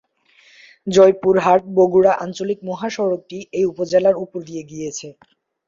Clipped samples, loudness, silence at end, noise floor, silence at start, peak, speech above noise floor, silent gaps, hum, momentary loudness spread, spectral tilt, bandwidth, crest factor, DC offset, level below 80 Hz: under 0.1%; -17 LUFS; 0.55 s; -54 dBFS; 0.85 s; -2 dBFS; 37 dB; none; none; 16 LU; -5.5 dB/octave; 7.6 kHz; 16 dB; under 0.1%; -58 dBFS